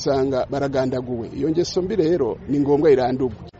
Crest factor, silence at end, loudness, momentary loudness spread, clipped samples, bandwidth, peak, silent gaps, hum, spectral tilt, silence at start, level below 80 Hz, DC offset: 14 dB; 0.1 s; -21 LUFS; 8 LU; under 0.1%; 7.8 kHz; -6 dBFS; none; none; -6.5 dB/octave; 0 s; -46 dBFS; under 0.1%